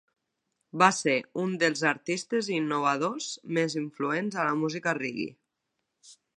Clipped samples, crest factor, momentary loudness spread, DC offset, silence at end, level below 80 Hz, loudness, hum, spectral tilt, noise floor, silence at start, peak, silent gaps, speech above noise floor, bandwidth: under 0.1%; 26 dB; 9 LU; under 0.1%; 0.25 s; -78 dBFS; -28 LUFS; none; -4 dB/octave; -82 dBFS; 0.75 s; -4 dBFS; none; 54 dB; 11.5 kHz